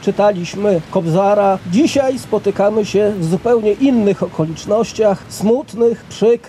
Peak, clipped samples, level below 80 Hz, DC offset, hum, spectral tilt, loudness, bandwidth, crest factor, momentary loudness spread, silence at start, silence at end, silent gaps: -2 dBFS; under 0.1%; -48 dBFS; under 0.1%; none; -6.5 dB/octave; -15 LUFS; 14.5 kHz; 12 dB; 5 LU; 0 s; 0 s; none